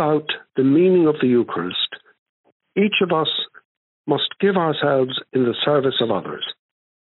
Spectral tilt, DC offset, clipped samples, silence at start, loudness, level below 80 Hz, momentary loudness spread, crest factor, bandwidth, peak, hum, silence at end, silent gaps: -4 dB/octave; under 0.1%; under 0.1%; 0 s; -19 LUFS; -70 dBFS; 12 LU; 16 dB; 4.2 kHz; -4 dBFS; none; 0.5 s; 2.19-2.44 s, 2.52-2.60 s, 3.65-4.04 s